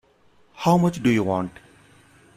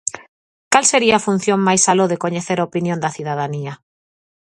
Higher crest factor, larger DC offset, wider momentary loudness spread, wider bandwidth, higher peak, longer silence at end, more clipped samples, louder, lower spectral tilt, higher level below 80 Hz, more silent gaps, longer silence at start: about the same, 18 dB vs 18 dB; neither; second, 8 LU vs 11 LU; first, 15 kHz vs 11.5 kHz; second, -6 dBFS vs 0 dBFS; about the same, 0.85 s vs 0.75 s; neither; second, -21 LUFS vs -17 LUFS; first, -7 dB/octave vs -3.5 dB/octave; about the same, -56 dBFS vs -60 dBFS; second, none vs 0.28-0.71 s; first, 0.55 s vs 0.05 s